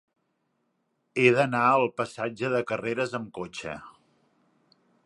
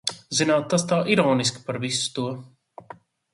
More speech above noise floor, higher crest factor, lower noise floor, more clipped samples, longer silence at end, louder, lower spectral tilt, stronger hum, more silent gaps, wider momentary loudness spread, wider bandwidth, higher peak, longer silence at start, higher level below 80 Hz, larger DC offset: first, 49 dB vs 24 dB; about the same, 24 dB vs 20 dB; first, -75 dBFS vs -47 dBFS; neither; first, 1.15 s vs 0.4 s; second, -26 LUFS vs -23 LUFS; first, -6 dB/octave vs -4 dB/octave; neither; neither; first, 15 LU vs 10 LU; about the same, 11 kHz vs 11.5 kHz; about the same, -6 dBFS vs -4 dBFS; first, 1.15 s vs 0.05 s; about the same, -68 dBFS vs -66 dBFS; neither